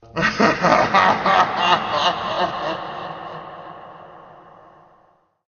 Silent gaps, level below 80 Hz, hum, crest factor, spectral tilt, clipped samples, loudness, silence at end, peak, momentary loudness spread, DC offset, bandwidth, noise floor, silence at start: none; -52 dBFS; none; 20 dB; -4 dB/octave; under 0.1%; -18 LUFS; 1.2 s; 0 dBFS; 20 LU; under 0.1%; 7 kHz; -59 dBFS; 0.15 s